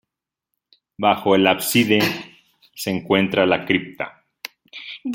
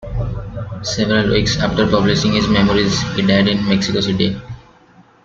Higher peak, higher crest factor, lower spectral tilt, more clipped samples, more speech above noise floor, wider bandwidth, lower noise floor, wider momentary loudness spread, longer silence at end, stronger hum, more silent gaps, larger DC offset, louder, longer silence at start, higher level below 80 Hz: about the same, -2 dBFS vs 0 dBFS; about the same, 20 dB vs 16 dB; about the same, -4.5 dB/octave vs -5.5 dB/octave; neither; first, 64 dB vs 33 dB; first, 17 kHz vs 7.6 kHz; first, -83 dBFS vs -48 dBFS; first, 19 LU vs 12 LU; second, 0 s vs 0.65 s; neither; neither; neither; second, -19 LUFS vs -16 LUFS; first, 1 s vs 0 s; second, -62 dBFS vs -34 dBFS